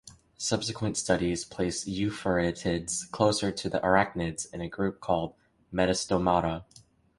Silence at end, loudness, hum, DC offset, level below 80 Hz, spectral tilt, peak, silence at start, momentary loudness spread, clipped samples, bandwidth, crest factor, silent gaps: 0.55 s; -29 LUFS; none; under 0.1%; -50 dBFS; -4.5 dB/octave; -6 dBFS; 0.05 s; 8 LU; under 0.1%; 11.5 kHz; 22 dB; none